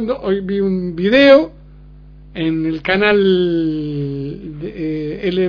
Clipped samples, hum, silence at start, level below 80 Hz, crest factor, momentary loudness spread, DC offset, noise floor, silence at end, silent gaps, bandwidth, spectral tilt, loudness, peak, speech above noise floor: under 0.1%; 50 Hz at -40 dBFS; 0 s; -42 dBFS; 16 dB; 16 LU; under 0.1%; -39 dBFS; 0 s; none; 5.4 kHz; -8 dB/octave; -16 LUFS; 0 dBFS; 24 dB